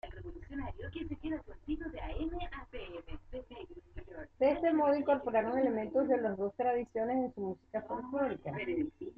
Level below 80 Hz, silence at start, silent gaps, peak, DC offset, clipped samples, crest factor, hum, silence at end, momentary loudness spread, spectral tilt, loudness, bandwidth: -52 dBFS; 0.05 s; none; -18 dBFS; under 0.1%; under 0.1%; 16 dB; none; 0.05 s; 18 LU; -9 dB/octave; -35 LUFS; 5.2 kHz